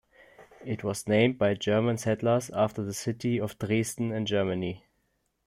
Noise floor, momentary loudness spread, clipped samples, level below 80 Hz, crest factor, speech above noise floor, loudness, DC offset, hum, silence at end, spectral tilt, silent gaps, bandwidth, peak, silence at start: -75 dBFS; 9 LU; under 0.1%; -64 dBFS; 20 dB; 47 dB; -28 LUFS; under 0.1%; none; 0.7 s; -5.5 dB/octave; none; 16.5 kHz; -10 dBFS; 0.4 s